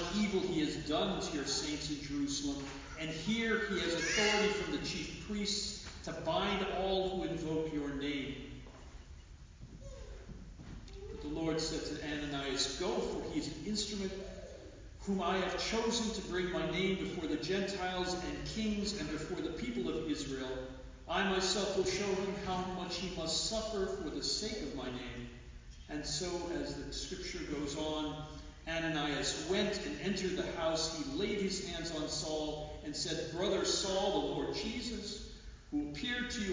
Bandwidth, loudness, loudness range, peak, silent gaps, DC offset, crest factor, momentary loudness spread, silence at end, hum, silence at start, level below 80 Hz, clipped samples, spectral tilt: 7.8 kHz; -36 LUFS; 6 LU; -18 dBFS; none; under 0.1%; 20 dB; 15 LU; 0 s; none; 0 s; -52 dBFS; under 0.1%; -3.5 dB/octave